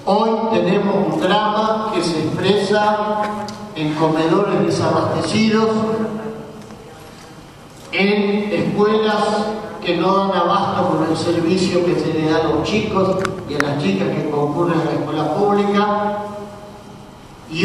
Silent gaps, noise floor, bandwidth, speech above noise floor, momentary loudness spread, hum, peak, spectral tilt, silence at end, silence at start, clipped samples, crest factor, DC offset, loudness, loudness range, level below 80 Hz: none; -39 dBFS; 13 kHz; 22 dB; 13 LU; none; 0 dBFS; -6 dB/octave; 0 s; 0 s; under 0.1%; 18 dB; under 0.1%; -18 LUFS; 3 LU; -50 dBFS